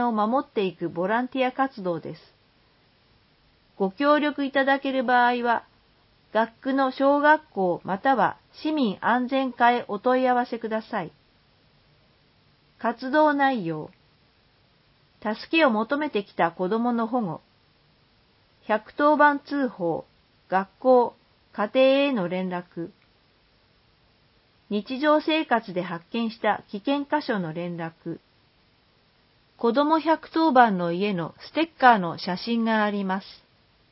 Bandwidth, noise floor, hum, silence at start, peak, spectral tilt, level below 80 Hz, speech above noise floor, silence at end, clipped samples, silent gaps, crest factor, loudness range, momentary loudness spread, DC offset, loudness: 5.8 kHz; -62 dBFS; none; 0 s; -2 dBFS; -10 dB/octave; -70 dBFS; 39 dB; 0.6 s; under 0.1%; none; 24 dB; 6 LU; 13 LU; under 0.1%; -24 LUFS